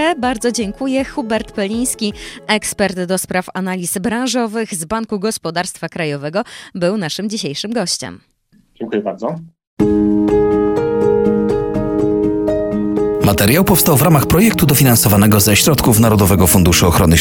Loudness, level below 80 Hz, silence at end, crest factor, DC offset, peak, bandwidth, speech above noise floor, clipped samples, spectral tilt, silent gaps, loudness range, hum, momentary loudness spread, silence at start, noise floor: -14 LUFS; -34 dBFS; 0 s; 14 dB; under 0.1%; 0 dBFS; 17.5 kHz; 39 dB; under 0.1%; -5 dB/octave; 9.67-9.77 s; 10 LU; none; 11 LU; 0 s; -53 dBFS